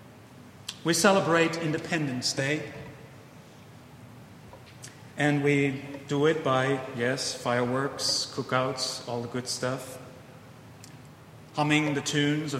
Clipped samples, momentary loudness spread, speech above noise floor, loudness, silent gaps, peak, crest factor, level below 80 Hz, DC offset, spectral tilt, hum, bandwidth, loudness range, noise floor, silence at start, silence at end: under 0.1%; 24 LU; 22 dB; -27 LUFS; none; -6 dBFS; 24 dB; -66 dBFS; under 0.1%; -4 dB/octave; none; 16 kHz; 6 LU; -49 dBFS; 0 s; 0 s